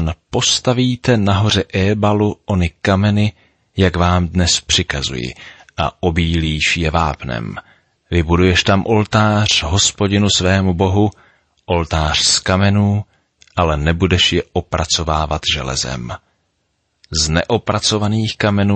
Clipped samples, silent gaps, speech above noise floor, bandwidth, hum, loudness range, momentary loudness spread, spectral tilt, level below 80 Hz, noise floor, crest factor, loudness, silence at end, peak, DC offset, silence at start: under 0.1%; none; 52 dB; 8.8 kHz; none; 4 LU; 9 LU; -4.5 dB/octave; -32 dBFS; -67 dBFS; 14 dB; -15 LUFS; 0 s; -2 dBFS; under 0.1%; 0 s